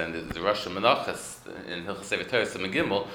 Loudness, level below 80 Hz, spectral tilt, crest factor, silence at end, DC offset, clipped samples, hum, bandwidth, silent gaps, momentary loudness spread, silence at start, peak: -28 LUFS; -56 dBFS; -4 dB/octave; 24 dB; 0 s; under 0.1%; under 0.1%; none; 20 kHz; none; 13 LU; 0 s; -6 dBFS